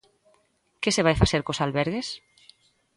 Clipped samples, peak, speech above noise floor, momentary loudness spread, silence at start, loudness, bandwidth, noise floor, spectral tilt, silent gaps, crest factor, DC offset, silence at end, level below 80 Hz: under 0.1%; -2 dBFS; 43 dB; 12 LU; 0.8 s; -25 LUFS; 11.5 kHz; -67 dBFS; -4.5 dB/octave; none; 24 dB; under 0.1%; 0.8 s; -40 dBFS